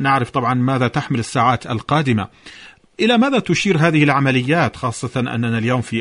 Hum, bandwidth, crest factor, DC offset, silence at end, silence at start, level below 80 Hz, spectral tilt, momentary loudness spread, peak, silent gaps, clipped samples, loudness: none; 11 kHz; 16 dB; under 0.1%; 0 s; 0 s; -50 dBFS; -6 dB/octave; 8 LU; -2 dBFS; none; under 0.1%; -17 LUFS